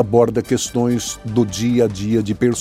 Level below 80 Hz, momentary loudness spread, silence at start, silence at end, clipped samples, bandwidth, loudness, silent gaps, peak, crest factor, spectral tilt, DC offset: -44 dBFS; 4 LU; 0 s; 0 s; under 0.1%; 15.5 kHz; -18 LUFS; none; 0 dBFS; 16 dB; -5.5 dB/octave; under 0.1%